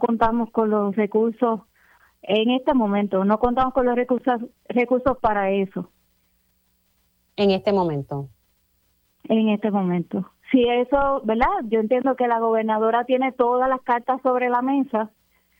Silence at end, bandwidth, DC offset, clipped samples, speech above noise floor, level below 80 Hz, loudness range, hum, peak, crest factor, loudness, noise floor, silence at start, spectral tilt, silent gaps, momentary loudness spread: 0.5 s; 15.5 kHz; under 0.1%; under 0.1%; 45 dB; -46 dBFS; 5 LU; none; -4 dBFS; 16 dB; -21 LUFS; -66 dBFS; 0 s; -8.5 dB/octave; none; 8 LU